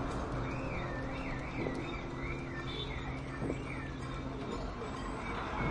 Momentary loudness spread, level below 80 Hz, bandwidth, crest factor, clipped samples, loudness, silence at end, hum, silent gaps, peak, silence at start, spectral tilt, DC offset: 3 LU; -46 dBFS; 11 kHz; 18 dB; under 0.1%; -39 LUFS; 0 s; none; none; -20 dBFS; 0 s; -6.5 dB/octave; under 0.1%